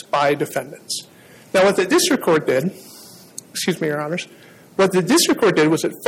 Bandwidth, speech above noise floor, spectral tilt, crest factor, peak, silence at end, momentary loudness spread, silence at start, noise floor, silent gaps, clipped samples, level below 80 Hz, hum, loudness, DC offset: 17 kHz; 24 dB; -4 dB/octave; 14 dB; -4 dBFS; 0 s; 15 LU; 0.15 s; -42 dBFS; none; under 0.1%; -62 dBFS; none; -18 LUFS; under 0.1%